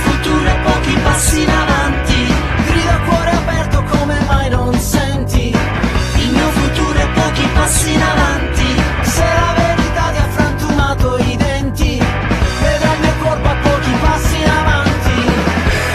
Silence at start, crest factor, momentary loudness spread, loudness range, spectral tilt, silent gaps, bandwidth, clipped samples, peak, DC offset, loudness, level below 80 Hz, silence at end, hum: 0 s; 12 dB; 3 LU; 1 LU; -5 dB/octave; none; 14 kHz; under 0.1%; 0 dBFS; under 0.1%; -14 LUFS; -18 dBFS; 0 s; none